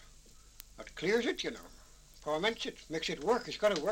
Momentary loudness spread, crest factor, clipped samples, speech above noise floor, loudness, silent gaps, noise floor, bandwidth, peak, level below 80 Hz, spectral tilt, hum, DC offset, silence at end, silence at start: 19 LU; 20 dB; under 0.1%; 24 dB; -34 LUFS; none; -57 dBFS; 16.5 kHz; -16 dBFS; -58 dBFS; -3.5 dB/octave; none; under 0.1%; 0 s; 0 s